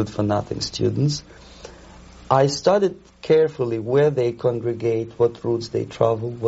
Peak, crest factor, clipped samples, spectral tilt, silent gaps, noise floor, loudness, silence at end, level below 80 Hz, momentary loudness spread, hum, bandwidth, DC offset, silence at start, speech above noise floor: -2 dBFS; 18 dB; under 0.1%; -6 dB/octave; none; -44 dBFS; -21 LUFS; 0 s; -50 dBFS; 9 LU; none; 8 kHz; under 0.1%; 0 s; 23 dB